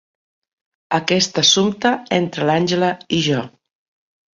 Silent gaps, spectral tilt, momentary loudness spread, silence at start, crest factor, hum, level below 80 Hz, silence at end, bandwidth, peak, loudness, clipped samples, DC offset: none; -3.5 dB/octave; 8 LU; 0.9 s; 18 dB; none; -58 dBFS; 0.85 s; 7.6 kHz; -2 dBFS; -17 LUFS; under 0.1%; under 0.1%